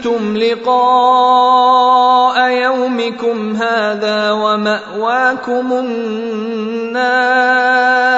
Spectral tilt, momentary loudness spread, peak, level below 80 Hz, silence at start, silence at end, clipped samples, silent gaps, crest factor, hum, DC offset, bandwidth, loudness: -4.5 dB/octave; 10 LU; 0 dBFS; -62 dBFS; 0 s; 0 s; under 0.1%; none; 12 dB; none; under 0.1%; 8 kHz; -13 LUFS